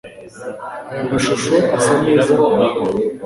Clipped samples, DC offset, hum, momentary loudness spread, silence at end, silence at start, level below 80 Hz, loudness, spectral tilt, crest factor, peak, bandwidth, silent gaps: under 0.1%; under 0.1%; none; 16 LU; 0 s; 0.05 s; -48 dBFS; -15 LUFS; -5 dB/octave; 14 dB; -2 dBFS; 11.5 kHz; none